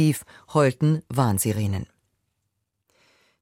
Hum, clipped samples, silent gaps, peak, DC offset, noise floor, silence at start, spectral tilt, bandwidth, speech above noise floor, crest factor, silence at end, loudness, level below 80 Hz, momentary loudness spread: none; under 0.1%; none; -6 dBFS; under 0.1%; -77 dBFS; 0 s; -6 dB/octave; 16.5 kHz; 55 dB; 20 dB; 1.55 s; -24 LUFS; -56 dBFS; 11 LU